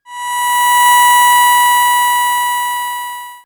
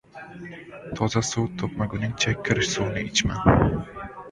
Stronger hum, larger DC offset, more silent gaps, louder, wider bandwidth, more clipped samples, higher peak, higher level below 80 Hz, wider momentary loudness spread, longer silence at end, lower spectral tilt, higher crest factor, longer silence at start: neither; neither; neither; first, -10 LUFS vs -24 LUFS; first, over 20 kHz vs 11 kHz; neither; first, 0 dBFS vs -4 dBFS; second, -62 dBFS vs -40 dBFS; second, 13 LU vs 19 LU; about the same, 0.1 s vs 0 s; second, 3.5 dB/octave vs -4.5 dB/octave; second, 12 dB vs 22 dB; about the same, 0.1 s vs 0.15 s